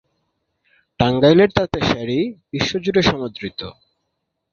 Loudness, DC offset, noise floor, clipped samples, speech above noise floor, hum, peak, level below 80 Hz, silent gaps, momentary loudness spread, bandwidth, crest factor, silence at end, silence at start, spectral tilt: -18 LUFS; under 0.1%; -75 dBFS; under 0.1%; 57 dB; none; 0 dBFS; -44 dBFS; none; 16 LU; 7.4 kHz; 18 dB; 0.8 s; 1 s; -6 dB/octave